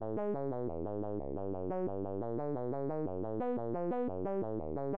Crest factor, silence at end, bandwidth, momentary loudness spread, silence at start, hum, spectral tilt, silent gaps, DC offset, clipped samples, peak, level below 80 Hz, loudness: 10 dB; 0 s; 4 kHz; 3 LU; 0 s; none; -10 dB/octave; none; 0.5%; under 0.1%; -28 dBFS; -62 dBFS; -38 LUFS